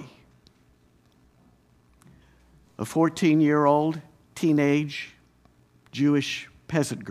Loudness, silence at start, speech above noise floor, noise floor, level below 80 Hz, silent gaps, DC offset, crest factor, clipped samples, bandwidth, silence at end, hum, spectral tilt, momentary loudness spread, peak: -24 LUFS; 0 s; 38 dB; -61 dBFS; -64 dBFS; none; under 0.1%; 20 dB; under 0.1%; 14 kHz; 0 s; none; -6 dB/octave; 17 LU; -6 dBFS